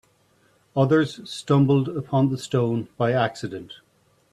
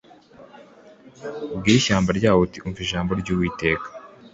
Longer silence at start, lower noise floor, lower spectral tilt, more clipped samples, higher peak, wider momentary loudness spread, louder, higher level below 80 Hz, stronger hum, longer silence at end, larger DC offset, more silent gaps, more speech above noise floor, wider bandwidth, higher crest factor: first, 0.75 s vs 0.4 s; first, -62 dBFS vs -48 dBFS; first, -7 dB/octave vs -5 dB/octave; neither; about the same, -6 dBFS vs -4 dBFS; about the same, 15 LU vs 17 LU; about the same, -23 LUFS vs -22 LUFS; second, -62 dBFS vs -44 dBFS; neither; first, 0.6 s vs 0.05 s; neither; neither; first, 40 dB vs 27 dB; first, 11 kHz vs 8 kHz; about the same, 16 dB vs 20 dB